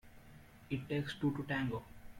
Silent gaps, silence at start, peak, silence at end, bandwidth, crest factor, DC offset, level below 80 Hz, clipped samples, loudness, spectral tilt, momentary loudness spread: none; 0.05 s; -24 dBFS; 0 s; 16.5 kHz; 16 dB; under 0.1%; -62 dBFS; under 0.1%; -39 LUFS; -7 dB/octave; 23 LU